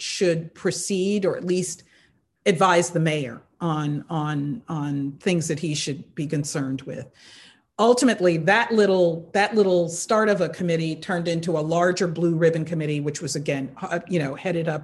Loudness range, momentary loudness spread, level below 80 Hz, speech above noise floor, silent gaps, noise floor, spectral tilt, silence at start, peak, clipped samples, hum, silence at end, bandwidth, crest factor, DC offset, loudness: 6 LU; 11 LU; -62 dBFS; 39 dB; none; -61 dBFS; -5 dB/octave; 0 s; -4 dBFS; under 0.1%; none; 0 s; 12.5 kHz; 18 dB; under 0.1%; -23 LUFS